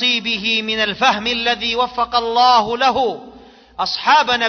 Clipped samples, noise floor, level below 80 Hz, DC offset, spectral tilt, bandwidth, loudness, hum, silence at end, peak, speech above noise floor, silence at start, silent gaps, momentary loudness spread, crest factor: under 0.1%; -42 dBFS; -50 dBFS; under 0.1%; -2.5 dB/octave; 6.6 kHz; -16 LUFS; none; 0 s; -2 dBFS; 26 dB; 0 s; none; 9 LU; 16 dB